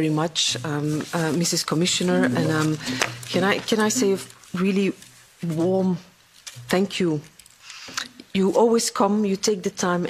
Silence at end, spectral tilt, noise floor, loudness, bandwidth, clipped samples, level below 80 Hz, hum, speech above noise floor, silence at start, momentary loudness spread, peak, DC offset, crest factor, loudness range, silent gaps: 0 s; -4.5 dB/octave; -44 dBFS; -23 LUFS; 15.5 kHz; under 0.1%; -62 dBFS; none; 22 dB; 0 s; 11 LU; -2 dBFS; under 0.1%; 22 dB; 4 LU; none